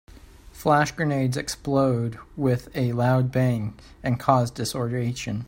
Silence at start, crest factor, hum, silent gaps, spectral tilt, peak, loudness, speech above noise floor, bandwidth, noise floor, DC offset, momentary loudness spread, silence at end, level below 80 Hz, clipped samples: 0.15 s; 22 dB; none; none; -6.5 dB/octave; -2 dBFS; -24 LUFS; 23 dB; 16 kHz; -46 dBFS; under 0.1%; 8 LU; 0 s; -50 dBFS; under 0.1%